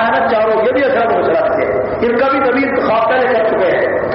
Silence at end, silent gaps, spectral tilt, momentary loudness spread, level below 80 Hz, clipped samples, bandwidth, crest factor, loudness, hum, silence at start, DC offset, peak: 0 s; none; -3.5 dB/octave; 2 LU; -44 dBFS; under 0.1%; 5.8 kHz; 10 dB; -13 LUFS; none; 0 s; under 0.1%; -4 dBFS